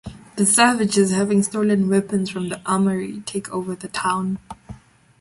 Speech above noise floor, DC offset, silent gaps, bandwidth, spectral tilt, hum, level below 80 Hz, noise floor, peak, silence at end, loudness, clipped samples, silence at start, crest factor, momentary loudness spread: 22 dB; under 0.1%; none; 11.5 kHz; -4.5 dB/octave; none; -54 dBFS; -42 dBFS; -2 dBFS; 0.45 s; -20 LUFS; under 0.1%; 0.05 s; 20 dB; 13 LU